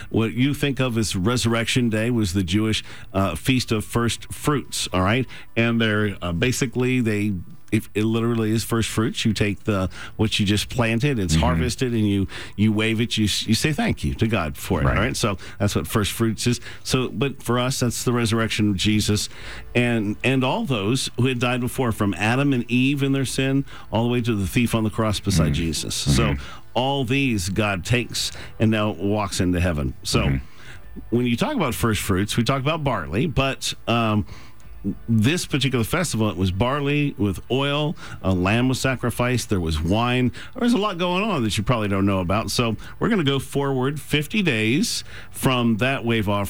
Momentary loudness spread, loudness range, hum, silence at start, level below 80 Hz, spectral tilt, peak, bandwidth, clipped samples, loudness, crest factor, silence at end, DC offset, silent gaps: 5 LU; 1 LU; none; 0 s; -38 dBFS; -5 dB/octave; -8 dBFS; over 20 kHz; under 0.1%; -22 LUFS; 14 dB; 0 s; 1%; none